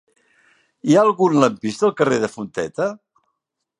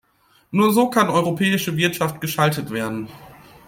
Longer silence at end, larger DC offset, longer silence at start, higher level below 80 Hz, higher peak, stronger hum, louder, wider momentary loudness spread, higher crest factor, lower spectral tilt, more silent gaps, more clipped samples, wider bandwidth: first, 0.85 s vs 0.35 s; neither; first, 0.85 s vs 0.5 s; second, -64 dBFS vs -58 dBFS; about the same, 0 dBFS vs -2 dBFS; neither; about the same, -19 LUFS vs -20 LUFS; about the same, 11 LU vs 10 LU; about the same, 20 dB vs 18 dB; about the same, -6 dB/octave vs -5 dB/octave; neither; neither; second, 11 kHz vs 16.5 kHz